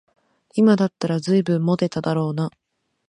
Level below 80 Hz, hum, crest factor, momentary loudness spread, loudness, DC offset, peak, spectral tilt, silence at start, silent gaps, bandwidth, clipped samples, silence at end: -62 dBFS; none; 16 dB; 10 LU; -21 LUFS; under 0.1%; -6 dBFS; -7.5 dB/octave; 0.55 s; none; 10.5 kHz; under 0.1%; 0.6 s